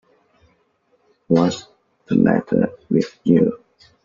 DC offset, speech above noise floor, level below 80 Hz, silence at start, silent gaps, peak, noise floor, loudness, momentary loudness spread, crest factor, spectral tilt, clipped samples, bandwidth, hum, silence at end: under 0.1%; 46 dB; -56 dBFS; 1.3 s; none; -2 dBFS; -63 dBFS; -19 LUFS; 5 LU; 18 dB; -7.5 dB/octave; under 0.1%; 7.4 kHz; none; 0.5 s